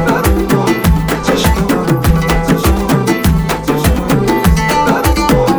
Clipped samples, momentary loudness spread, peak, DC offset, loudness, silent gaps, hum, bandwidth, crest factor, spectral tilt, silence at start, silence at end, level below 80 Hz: under 0.1%; 2 LU; 0 dBFS; under 0.1%; -12 LUFS; none; none; over 20 kHz; 12 dB; -5.5 dB/octave; 0 s; 0 s; -18 dBFS